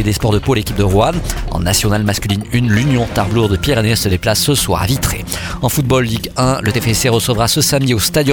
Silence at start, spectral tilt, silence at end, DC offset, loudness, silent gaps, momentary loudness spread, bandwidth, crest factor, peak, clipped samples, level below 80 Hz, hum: 0 s; -4.5 dB/octave; 0 s; under 0.1%; -14 LUFS; none; 5 LU; 19.5 kHz; 14 dB; 0 dBFS; under 0.1%; -28 dBFS; none